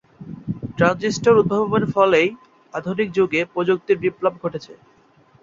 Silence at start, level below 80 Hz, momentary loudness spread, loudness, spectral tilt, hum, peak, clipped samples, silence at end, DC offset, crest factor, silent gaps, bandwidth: 0.2 s; -54 dBFS; 15 LU; -19 LUFS; -6 dB/octave; none; -2 dBFS; under 0.1%; 0.7 s; under 0.1%; 18 dB; none; 7.6 kHz